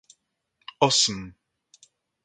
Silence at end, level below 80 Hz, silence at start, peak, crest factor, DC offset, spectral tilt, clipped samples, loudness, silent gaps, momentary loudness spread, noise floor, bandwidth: 0.95 s; -62 dBFS; 0.8 s; -2 dBFS; 26 dB; under 0.1%; -2 dB/octave; under 0.1%; -21 LUFS; none; 26 LU; -73 dBFS; 11 kHz